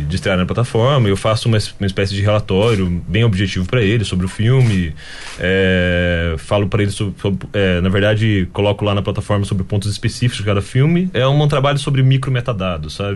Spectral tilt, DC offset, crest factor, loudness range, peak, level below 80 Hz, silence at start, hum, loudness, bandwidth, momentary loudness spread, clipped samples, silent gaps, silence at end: -6.5 dB/octave; under 0.1%; 12 dB; 1 LU; -4 dBFS; -34 dBFS; 0 s; none; -16 LUFS; 11.5 kHz; 6 LU; under 0.1%; none; 0 s